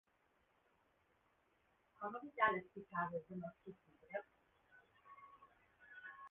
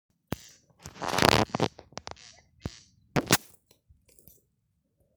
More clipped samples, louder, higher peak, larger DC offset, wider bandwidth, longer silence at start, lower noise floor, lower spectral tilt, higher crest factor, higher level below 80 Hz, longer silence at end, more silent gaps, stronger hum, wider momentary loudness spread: neither; second, -44 LUFS vs -26 LUFS; second, -20 dBFS vs 0 dBFS; neither; second, 3.8 kHz vs over 20 kHz; first, 2 s vs 0.3 s; first, -79 dBFS vs -75 dBFS; second, 0 dB/octave vs -3.5 dB/octave; about the same, 28 dB vs 32 dB; second, -82 dBFS vs -52 dBFS; second, 0 s vs 1.8 s; neither; neither; about the same, 24 LU vs 23 LU